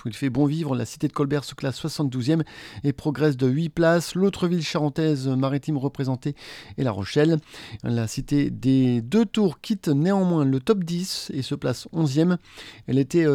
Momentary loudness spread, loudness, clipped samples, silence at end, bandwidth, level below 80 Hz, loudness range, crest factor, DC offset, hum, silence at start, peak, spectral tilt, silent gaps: 8 LU; -24 LUFS; under 0.1%; 0 s; 16 kHz; -54 dBFS; 3 LU; 18 dB; under 0.1%; none; 0.05 s; -6 dBFS; -6.5 dB/octave; none